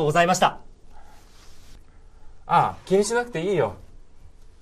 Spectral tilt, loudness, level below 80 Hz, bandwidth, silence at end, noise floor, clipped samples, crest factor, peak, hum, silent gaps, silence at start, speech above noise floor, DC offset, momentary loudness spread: -4.5 dB/octave; -22 LUFS; -48 dBFS; 14.5 kHz; 0.2 s; -45 dBFS; under 0.1%; 20 dB; -4 dBFS; none; none; 0 s; 24 dB; under 0.1%; 6 LU